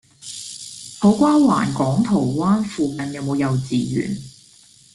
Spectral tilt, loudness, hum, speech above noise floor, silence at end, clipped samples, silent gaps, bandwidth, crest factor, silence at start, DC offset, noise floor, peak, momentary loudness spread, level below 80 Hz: -6.5 dB/octave; -19 LUFS; none; 32 dB; 0.65 s; under 0.1%; none; 12 kHz; 16 dB; 0.25 s; under 0.1%; -50 dBFS; -4 dBFS; 17 LU; -52 dBFS